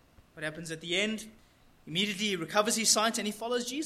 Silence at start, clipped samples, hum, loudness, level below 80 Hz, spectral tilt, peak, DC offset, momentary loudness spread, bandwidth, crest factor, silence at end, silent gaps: 0.2 s; under 0.1%; none; -30 LUFS; -66 dBFS; -2 dB/octave; -10 dBFS; under 0.1%; 15 LU; 16 kHz; 22 dB; 0 s; none